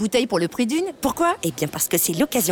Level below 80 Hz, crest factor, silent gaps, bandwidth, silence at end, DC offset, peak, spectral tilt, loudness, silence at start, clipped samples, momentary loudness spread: -52 dBFS; 14 dB; none; 19.5 kHz; 0 s; under 0.1%; -8 dBFS; -3.5 dB/octave; -21 LUFS; 0 s; under 0.1%; 5 LU